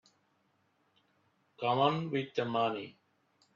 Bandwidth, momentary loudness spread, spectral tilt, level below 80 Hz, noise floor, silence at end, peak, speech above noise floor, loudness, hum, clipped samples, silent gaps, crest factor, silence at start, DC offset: 7.4 kHz; 11 LU; -7 dB/octave; -80 dBFS; -74 dBFS; 0.65 s; -14 dBFS; 43 dB; -33 LUFS; none; under 0.1%; none; 22 dB; 1.6 s; under 0.1%